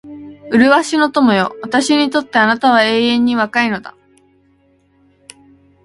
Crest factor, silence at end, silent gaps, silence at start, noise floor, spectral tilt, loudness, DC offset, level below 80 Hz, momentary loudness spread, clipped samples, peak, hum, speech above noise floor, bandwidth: 16 dB; 1.95 s; none; 0.05 s; -55 dBFS; -4 dB/octave; -13 LUFS; under 0.1%; -56 dBFS; 7 LU; under 0.1%; 0 dBFS; none; 42 dB; 11.5 kHz